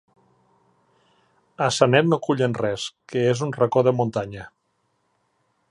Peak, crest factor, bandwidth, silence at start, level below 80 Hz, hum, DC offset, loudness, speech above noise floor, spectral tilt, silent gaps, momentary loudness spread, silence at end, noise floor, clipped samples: -2 dBFS; 22 dB; 11.5 kHz; 1.6 s; -62 dBFS; none; under 0.1%; -22 LUFS; 50 dB; -5.5 dB/octave; none; 12 LU; 1.25 s; -71 dBFS; under 0.1%